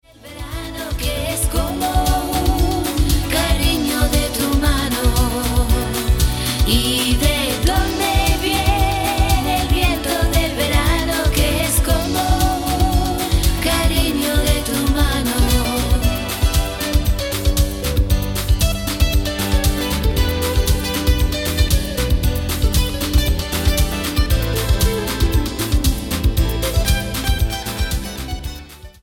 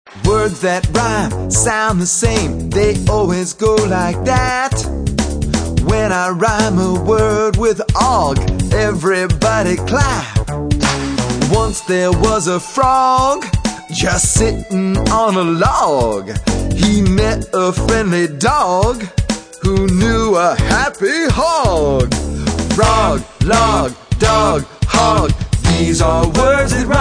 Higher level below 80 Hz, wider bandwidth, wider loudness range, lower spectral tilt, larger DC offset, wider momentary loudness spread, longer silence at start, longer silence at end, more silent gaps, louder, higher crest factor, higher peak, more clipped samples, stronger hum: about the same, -20 dBFS vs -24 dBFS; first, 17.5 kHz vs 10.5 kHz; about the same, 2 LU vs 2 LU; about the same, -4.5 dB/octave vs -5 dB/octave; neither; about the same, 4 LU vs 6 LU; first, 0.25 s vs 0.05 s; first, 0.15 s vs 0 s; neither; second, -18 LUFS vs -14 LUFS; about the same, 16 dB vs 14 dB; about the same, -2 dBFS vs 0 dBFS; neither; neither